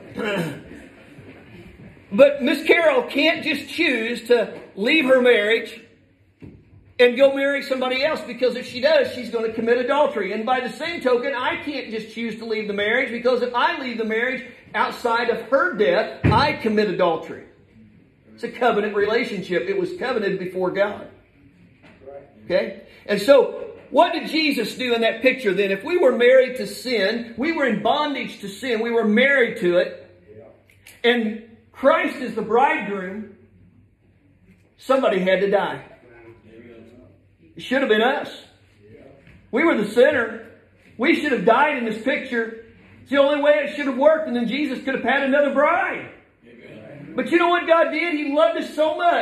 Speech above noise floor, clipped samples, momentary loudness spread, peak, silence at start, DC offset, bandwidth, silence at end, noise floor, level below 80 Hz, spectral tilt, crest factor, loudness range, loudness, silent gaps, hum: 37 dB; under 0.1%; 12 LU; -2 dBFS; 0 s; under 0.1%; 14 kHz; 0 s; -57 dBFS; -56 dBFS; -5.5 dB/octave; 20 dB; 5 LU; -20 LUFS; none; none